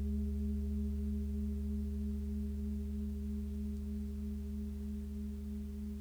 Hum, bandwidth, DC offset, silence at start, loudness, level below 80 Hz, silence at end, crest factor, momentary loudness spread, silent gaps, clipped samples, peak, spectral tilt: none; 13.5 kHz; under 0.1%; 0 s; -40 LUFS; -40 dBFS; 0 s; 10 dB; 5 LU; none; under 0.1%; -28 dBFS; -9 dB/octave